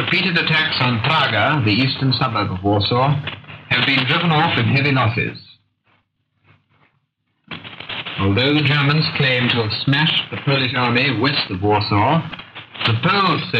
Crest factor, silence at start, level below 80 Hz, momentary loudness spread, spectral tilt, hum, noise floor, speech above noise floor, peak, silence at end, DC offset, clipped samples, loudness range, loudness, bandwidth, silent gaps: 14 dB; 0 s; -54 dBFS; 11 LU; -7.5 dB/octave; none; -68 dBFS; 51 dB; -4 dBFS; 0 s; under 0.1%; under 0.1%; 6 LU; -17 LUFS; 6.8 kHz; none